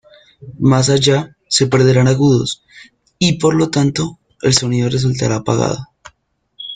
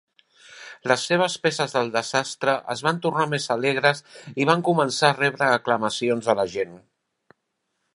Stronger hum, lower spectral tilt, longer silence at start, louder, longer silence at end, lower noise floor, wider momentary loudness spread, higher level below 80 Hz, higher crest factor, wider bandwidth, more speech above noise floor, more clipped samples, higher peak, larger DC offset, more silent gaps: neither; about the same, -5 dB/octave vs -4 dB/octave; about the same, 0.4 s vs 0.5 s; first, -15 LUFS vs -22 LUFS; second, 0 s vs 1.15 s; second, -60 dBFS vs -76 dBFS; about the same, 10 LU vs 9 LU; first, -46 dBFS vs -68 dBFS; second, 16 dB vs 22 dB; second, 9.4 kHz vs 11.5 kHz; second, 46 dB vs 54 dB; neither; about the same, 0 dBFS vs -2 dBFS; neither; neither